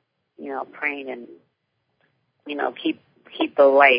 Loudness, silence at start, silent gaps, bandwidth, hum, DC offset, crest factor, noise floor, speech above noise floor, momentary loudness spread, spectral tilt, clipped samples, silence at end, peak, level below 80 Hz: -23 LUFS; 0.4 s; none; 5.2 kHz; none; under 0.1%; 22 dB; -74 dBFS; 53 dB; 22 LU; -7.5 dB/octave; under 0.1%; 0 s; 0 dBFS; -78 dBFS